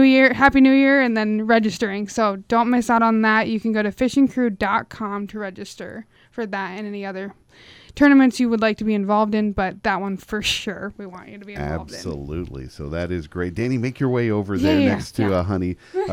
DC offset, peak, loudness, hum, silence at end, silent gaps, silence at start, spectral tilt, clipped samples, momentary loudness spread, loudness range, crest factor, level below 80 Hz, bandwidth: under 0.1%; -2 dBFS; -20 LUFS; none; 0 s; none; 0 s; -6 dB/octave; under 0.1%; 18 LU; 10 LU; 18 dB; -46 dBFS; 14.5 kHz